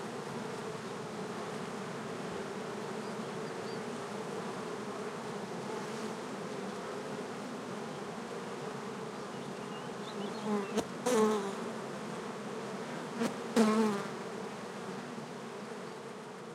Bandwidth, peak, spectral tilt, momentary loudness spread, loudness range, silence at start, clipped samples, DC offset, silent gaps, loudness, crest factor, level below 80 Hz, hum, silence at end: 15.5 kHz; -14 dBFS; -5 dB/octave; 10 LU; 6 LU; 0 s; under 0.1%; under 0.1%; none; -38 LUFS; 24 dB; -78 dBFS; none; 0 s